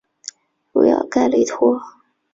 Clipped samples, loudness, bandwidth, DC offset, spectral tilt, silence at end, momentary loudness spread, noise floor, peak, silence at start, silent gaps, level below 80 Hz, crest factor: under 0.1%; -17 LUFS; 7.8 kHz; under 0.1%; -4.5 dB/octave; 0.45 s; 19 LU; -39 dBFS; -4 dBFS; 0.75 s; none; -60 dBFS; 16 dB